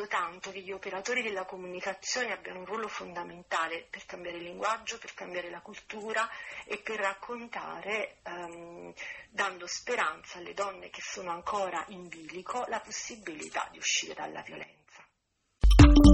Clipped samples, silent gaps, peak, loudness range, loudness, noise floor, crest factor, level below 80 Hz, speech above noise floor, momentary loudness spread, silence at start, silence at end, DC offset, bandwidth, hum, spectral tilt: under 0.1%; none; -6 dBFS; 2 LU; -32 LUFS; -78 dBFS; 24 dB; -34 dBFS; 41 dB; 12 LU; 0 s; 0 s; under 0.1%; 10.5 kHz; none; -5 dB/octave